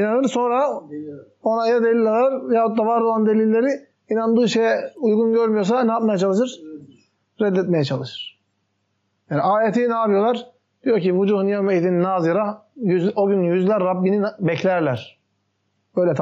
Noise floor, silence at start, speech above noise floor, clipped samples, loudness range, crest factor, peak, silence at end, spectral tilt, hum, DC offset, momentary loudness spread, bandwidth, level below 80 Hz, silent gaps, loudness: -70 dBFS; 0 s; 52 dB; under 0.1%; 4 LU; 10 dB; -8 dBFS; 0 s; -6 dB/octave; none; under 0.1%; 9 LU; 8 kHz; -76 dBFS; none; -20 LUFS